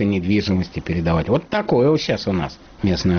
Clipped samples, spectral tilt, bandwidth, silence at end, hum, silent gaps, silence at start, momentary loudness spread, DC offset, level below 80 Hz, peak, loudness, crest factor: under 0.1%; -6 dB/octave; 6.6 kHz; 0 s; none; none; 0 s; 8 LU; under 0.1%; -38 dBFS; -6 dBFS; -20 LUFS; 12 dB